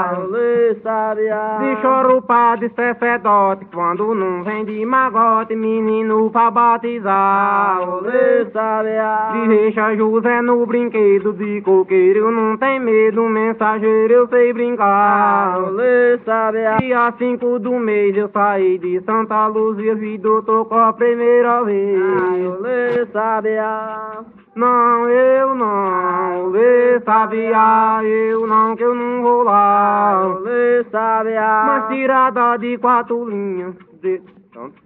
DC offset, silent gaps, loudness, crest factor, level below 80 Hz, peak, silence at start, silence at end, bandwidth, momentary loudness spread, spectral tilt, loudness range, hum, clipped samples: under 0.1%; none; -15 LUFS; 14 dB; -64 dBFS; -2 dBFS; 0 s; 0.15 s; 4 kHz; 7 LU; -10.5 dB/octave; 3 LU; none; under 0.1%